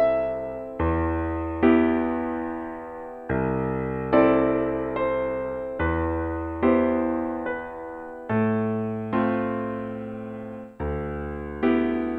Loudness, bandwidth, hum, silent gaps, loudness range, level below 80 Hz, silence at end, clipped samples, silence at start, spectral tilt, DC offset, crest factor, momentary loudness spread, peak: -25 LUFS; 4.5 kHz; none; none; 4 LU; -42 dBFS; 0 s; under 0.1%; 0 s; -10 dB/octave; under 0.1%; 18 dB; 14 LU; -6 dBFS